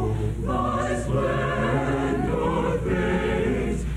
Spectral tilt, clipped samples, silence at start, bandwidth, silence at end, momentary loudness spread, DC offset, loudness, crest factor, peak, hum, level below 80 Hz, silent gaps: -7 dB/octave; under 0.1%; 0 s; 13 kHz; 0 s; 2 LU; under 0.1%; -24 LUFS; 12 dB; -12 dBFS; none; -32 dBFS; none